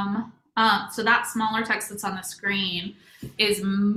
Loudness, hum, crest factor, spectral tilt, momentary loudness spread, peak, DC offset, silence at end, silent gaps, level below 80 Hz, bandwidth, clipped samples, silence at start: -24 LUFS; none; 20 dB; -3.5 dB/octave; 10 LU; -6 dBFS; under 0.1%; 0 s; none; -62 dBFS; 15.5 kHz; under 0.1%; 0 s